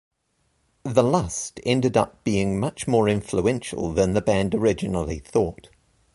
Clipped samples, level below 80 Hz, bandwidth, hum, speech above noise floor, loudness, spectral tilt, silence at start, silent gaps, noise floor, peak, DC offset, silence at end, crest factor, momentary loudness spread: under 0.1%; -44 dBFS; 11.5 kHz; none; 47 dB; -23 LUFS; -6 dB/octave; 0.85 s; none; -70 dBFS; -4 dBFS; under 0.1%; 0.5 s; 20 dB; 7 LU